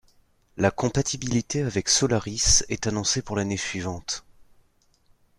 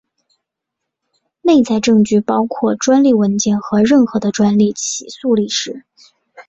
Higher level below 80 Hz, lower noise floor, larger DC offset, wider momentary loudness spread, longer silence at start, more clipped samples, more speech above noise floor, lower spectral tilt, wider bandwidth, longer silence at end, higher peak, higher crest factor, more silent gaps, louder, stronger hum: first, -42 dBFS vs -54 dBFS; second, -63 dBFS vs -79 dBFS; neither; first, 12 LU vs 9 LU; second, 0.55 s vs 1.45 s; neither; second, 38 dB vs 65 dB; second, -3 dB/octave vs -5 dB/octave; first, 14.5 kHz vs 8 kHz; first, 0.95 s vs 0.05 s; second, -6 dBFS vs -2 dBFS; first, 20 dB vs 12 dB; neither; second, -24 LUFS vs -14 LUFS; neither